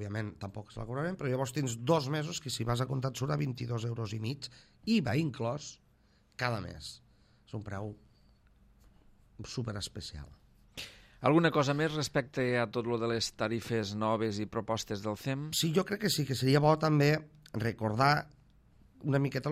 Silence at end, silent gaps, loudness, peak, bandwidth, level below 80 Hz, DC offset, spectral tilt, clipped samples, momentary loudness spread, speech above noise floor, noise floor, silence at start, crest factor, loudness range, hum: 0 s; none; -32 LUFS; -12 dBFS; 15.5 kHz; -60 dBFS; under 0.1%; -5.5 dB/octave; under 0.1%; 17 LU; 34 dB; -66 dBFS; 0 s; 20 dB; 13 LU; none